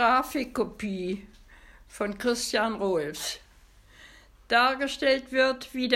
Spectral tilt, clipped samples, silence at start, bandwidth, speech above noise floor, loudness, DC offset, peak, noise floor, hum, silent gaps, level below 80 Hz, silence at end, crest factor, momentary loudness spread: -3 dB/octave; under 0.1%; 0 s; 16 kHz; 28 dB; -27 LUFS; under 0.1%; -6 dBFS; -56 dBFS; none; none; -56 dBFS; 0 s; 22 dB; 11 LU